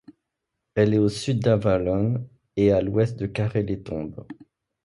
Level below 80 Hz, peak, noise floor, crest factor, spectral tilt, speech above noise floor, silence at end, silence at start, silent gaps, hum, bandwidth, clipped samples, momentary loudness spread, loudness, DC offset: -48 dBFS; -6 dBFS; -81 dBFS; 18 dB; -7.5 dB/octave; 59 dB; 0.5 s; 0.75 s; none; none; 11.5 kHz; under 0.1%; 12 LU; -24 LUFS; under 0.1%